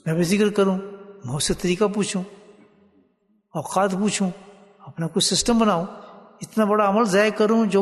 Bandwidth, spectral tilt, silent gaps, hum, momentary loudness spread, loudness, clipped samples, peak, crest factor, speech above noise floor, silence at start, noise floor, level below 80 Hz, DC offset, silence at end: 12.5 kHz; -4.5 dB/octave; none; none; 19 LU; -21 LUFS; under 0.1%; -6 dBFS; 16 dB; 44 dB; 0.05 s; -65 dBFS; -50 dBFS; under 0.1%; 0 s